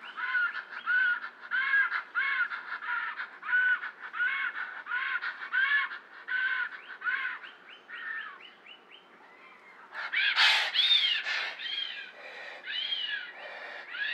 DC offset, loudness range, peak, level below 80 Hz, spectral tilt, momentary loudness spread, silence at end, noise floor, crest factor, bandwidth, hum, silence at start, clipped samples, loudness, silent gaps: under 0.1%; 8 LU; -10 dBFS; under -90 dBFS; 2 dB/octave; 19 LU; 0 s; -55 dBFS; 22 dB; 12.5 kHz; none; 0 s; under 0.1%; -29 LUFS; none